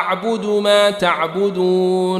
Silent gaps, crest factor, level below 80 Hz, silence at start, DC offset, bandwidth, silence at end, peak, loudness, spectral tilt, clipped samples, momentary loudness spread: none; 14 dB; -60 dBFS; 0 s; under 0.1%; 14 kHz; 0 s; -2 dBFS; -16 LUFS; -5 dB/octave; under 0.1%; 5 LU